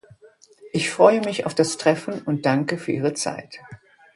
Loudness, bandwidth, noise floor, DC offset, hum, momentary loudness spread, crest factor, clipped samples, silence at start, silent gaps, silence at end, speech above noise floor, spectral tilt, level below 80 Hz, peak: -22 LUFS; 11.5 kHz; -52 dBFS; under 0.1%; none; 13 LU; 22 dB; under 0.1%; 0.65 s; none; 0.4 s; 31 dB; -5 dB/octave; -66 dBFS; 0 dBFS